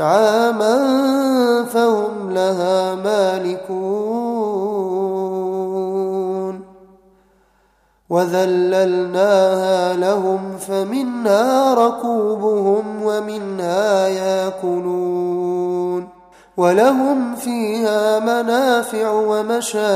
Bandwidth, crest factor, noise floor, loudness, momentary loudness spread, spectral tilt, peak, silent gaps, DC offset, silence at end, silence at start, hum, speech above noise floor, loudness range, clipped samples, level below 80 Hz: 15.5 kHz; 16 dB; -59 dBFS; -18 LUFS; 8 LU; -5 dB/octave; -2 dBFS; none; under 0.1%; 0 s; 0 s; none; 42 dB; 5 LU; under 0.1%; -64 dBFS